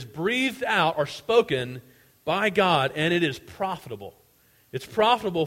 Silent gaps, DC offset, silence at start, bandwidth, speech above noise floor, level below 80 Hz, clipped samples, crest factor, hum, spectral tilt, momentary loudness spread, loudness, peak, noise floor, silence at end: none; under 0.1%; 0 s; 16.5 kHz; 36 dB; -60 dBFS; under 0.1%; 18 dB; none; -5 dB/octave; 16 LU; -24 LUFS; -6 dBFS; -61 dBFS; 0 s